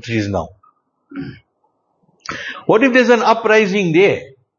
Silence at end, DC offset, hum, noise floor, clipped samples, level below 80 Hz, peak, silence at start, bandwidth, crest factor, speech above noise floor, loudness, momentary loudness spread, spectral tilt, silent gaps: 0.3 s; under 0.1%; none; -65 dBFS; under 0.1%; -52 dBFS; 0 dBFS; 0 s; 7.4 kHz; 16 dB; 51 dB; -14 LUFS; 22 LU; -5.5 dB/octave; none